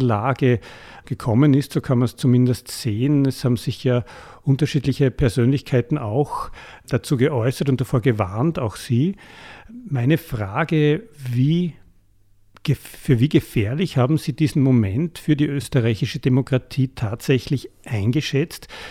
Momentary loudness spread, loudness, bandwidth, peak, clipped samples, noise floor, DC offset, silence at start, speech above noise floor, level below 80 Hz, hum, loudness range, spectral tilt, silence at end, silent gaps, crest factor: 10 LU; -21 LUFS; 15 kHz; -4 dBFS; under 0.1%; -54 dBFS; under 0.1%; 0 s; 34 dB; -44 dBFS; none; 3 LU; -7 dB/octave; 0 s; none; 16 dB